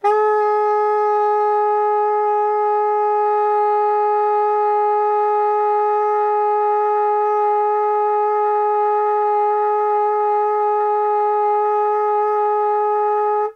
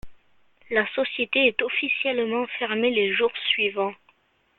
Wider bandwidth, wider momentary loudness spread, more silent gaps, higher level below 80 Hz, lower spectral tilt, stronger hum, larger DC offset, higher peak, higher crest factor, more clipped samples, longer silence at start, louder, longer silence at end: first, 5.8 kHz vs 4.3 kHz; second, 1 LU vs 6 LU; neither; second, -84 dBFS vs -60 dBFS; second, -4 dB/octave vs -6.5 dB/octave; neither; neither; about the same, -6 dBFS vs -6 dBFS; second, 10 dB vs 20 dB; neither; about the same, 0.05 s vs 0.05 s; first, -17 LUFS vs -23 LUFS; second, 0.05 s vs 0.65 s